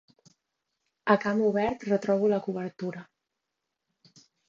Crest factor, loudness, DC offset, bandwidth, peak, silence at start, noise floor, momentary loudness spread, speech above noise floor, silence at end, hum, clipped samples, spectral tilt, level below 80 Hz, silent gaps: 22 dB; -27 LUFS; under 0.1%; 7.4 kHz; -8 dBFS; 1.05 s; -84 dBFS; 12 LU; 58 dB; 1.45 s; none; under 0.1%; -7 dB/octave; -64 dBFS; none